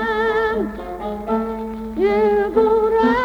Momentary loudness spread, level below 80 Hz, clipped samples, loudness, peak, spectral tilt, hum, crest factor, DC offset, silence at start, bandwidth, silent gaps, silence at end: 11 LU; -40 dBFS; under 0.1%; -19 LUFS; -6 dBFS; -7 dB/octave; none; 14 dB; under 0.1%; 0 s; 6.8 kHz; none; 0 s